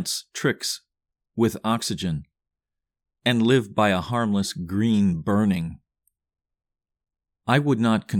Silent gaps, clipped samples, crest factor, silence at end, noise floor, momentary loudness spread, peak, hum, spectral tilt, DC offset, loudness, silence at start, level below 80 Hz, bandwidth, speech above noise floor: none; under 0.1%; 18 dB; 0 s; -86 dBFS; 9 LU; -6 dBFS; none; -5.5 dB/octave; under 0.1%; -23 LUFS; 0 s; -54 dBFS; 18.5 kHz; 63 dB